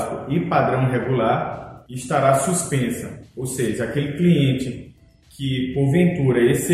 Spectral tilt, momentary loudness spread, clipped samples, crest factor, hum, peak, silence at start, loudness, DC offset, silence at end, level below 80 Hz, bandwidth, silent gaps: -6 dB/octave; 13 LU; under 0.1%; 18 dB; none; -2 dBFS; 0 s; -20 LUFS; under 0.1%; 0 s; -48 dBFS; 15 kHz; none